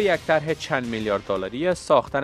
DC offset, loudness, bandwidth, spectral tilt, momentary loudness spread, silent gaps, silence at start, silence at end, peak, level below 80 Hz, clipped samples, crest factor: under 0.1%; -23 LUFS; 13.5 kHz; -5 dB/octave; 5 LU; none; 0 s; 0 s; -4 dBFS; -50 dBFS; under 0.1%; 18 dB